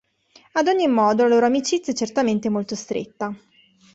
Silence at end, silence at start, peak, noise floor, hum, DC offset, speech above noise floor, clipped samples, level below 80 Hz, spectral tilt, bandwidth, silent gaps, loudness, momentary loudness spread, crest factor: 0.6 s; 0.55 s; -6 dBFS; -55 dBFS; none; under 0.1%; 35 dB; under 0.1%; -64 dBFS; -4.5 dB/octave; 8.2 kHz; none; -21 LUFS; 13 LU; 14 dB